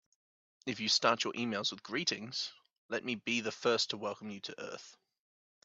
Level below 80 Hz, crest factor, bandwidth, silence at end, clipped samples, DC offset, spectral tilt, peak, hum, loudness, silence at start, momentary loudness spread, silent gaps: -82 dBFS; 26 dB; 8.4 kHz; 0.7 s; under 0.1%; under 0.1%; -2.5 dB/octave; -12 dBFS; none; -34 LUFS; 0.65 s; 14 LU; 2.78-2.89 s